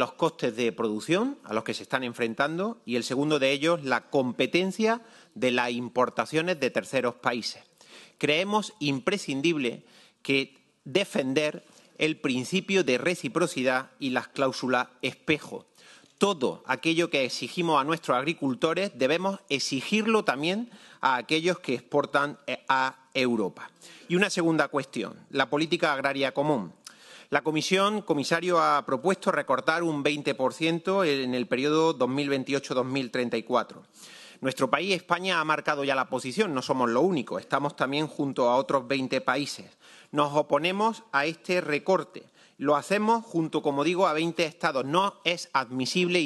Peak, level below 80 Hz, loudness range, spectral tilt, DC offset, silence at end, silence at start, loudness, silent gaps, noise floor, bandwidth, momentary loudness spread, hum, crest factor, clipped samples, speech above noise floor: -6 dBFS; -76 dBFS; 2 LU; -4.5 dB/octave; under 0.1%; 0 s; 0 s; -27 LUFS; none; -55 dBFS; 12.5 kHz; 6 LU; none; 22 dB; under 0.1%; 28 dB